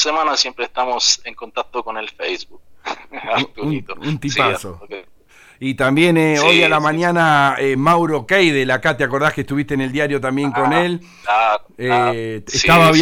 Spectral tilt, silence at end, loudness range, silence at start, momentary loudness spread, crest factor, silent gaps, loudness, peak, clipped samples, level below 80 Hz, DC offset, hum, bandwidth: -4 dB/octave; 0 s; 8 LU; 0 s; 15 LU; 16 dB; none; -16 LUFS; 0 dBFS; under 0.1%; -46 dBFS; under 0.1%; none; 17 kHz